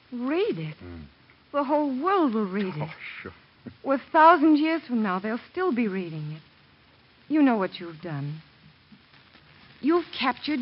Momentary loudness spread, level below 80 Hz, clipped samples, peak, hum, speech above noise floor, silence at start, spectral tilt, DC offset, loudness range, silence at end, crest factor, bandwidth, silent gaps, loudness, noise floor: 19 LU; -66 dBFS; under 0.1%; -4 dBFS; none; 33 dB; 0.1 s; -4.5 dB/octave; under 0.1%; 7 LU; 0 s; 22 dB; 5.6 kHz; none; -25 LUFS; -57 dBFS